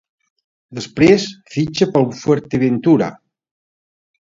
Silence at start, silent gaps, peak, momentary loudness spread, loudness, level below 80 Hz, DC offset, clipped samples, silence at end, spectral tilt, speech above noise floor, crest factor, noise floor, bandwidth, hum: 0.7 s; none; 0 dBFS; 13 LU; -16 LUFS; -50 dBFS; under 0.1%; under 0.1%; 1.2 s; -6.5 dB/octave; over 75 dB; 18 dB; under -90 dBFS; 7.8 kHz; none